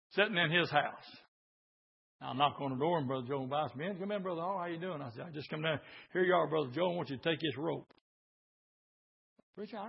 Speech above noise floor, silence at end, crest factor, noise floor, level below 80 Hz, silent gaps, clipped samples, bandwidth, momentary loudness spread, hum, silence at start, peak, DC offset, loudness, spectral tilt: over 55 dB; 0 s; 24 dB; under -90 dBFS; -80 dBFS; 1.28-2.19 s, 8.01-9.36 s, 9.43-9.53 s; under 0.1%; 5.6 kHz; 14 LU; none; 0.1 s; -14 dBFS; under 0.1%; -35 LUFS; -3 dB/octave